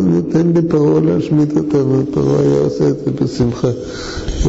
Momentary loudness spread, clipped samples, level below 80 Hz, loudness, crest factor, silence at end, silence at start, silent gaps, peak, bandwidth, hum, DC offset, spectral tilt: 6 LU; under 0.1%; -30 dBFS; -15 LUFS; 8 dB; 0 s; 0 s; none; -6 dBFS; 8 kHz; none; 0.2%; -8 dB/octave